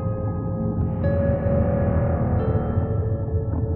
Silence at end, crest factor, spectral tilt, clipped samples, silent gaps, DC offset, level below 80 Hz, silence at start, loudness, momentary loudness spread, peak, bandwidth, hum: 0 s; 14 dB; -14 dB/octave; under 0.1%; none; under 0.1%; -32 dBFS; 0 s; -23 LUFS; 4 LU; -8 dBFS; 3.3 kHz; none